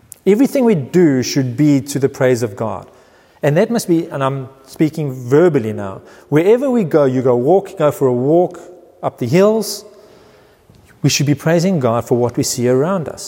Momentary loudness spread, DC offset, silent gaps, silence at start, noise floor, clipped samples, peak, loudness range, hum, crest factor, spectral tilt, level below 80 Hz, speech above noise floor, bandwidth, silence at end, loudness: 11 LU; under 0.1%; none; 0.25 s; -47 dBFS; under 0.1%; 0 dBFS; 3 LU; none; 14 dB; -6 dB/octave; -58 dBFS; 33 dB; 16.5 kHz; 0 s; -15 LUFS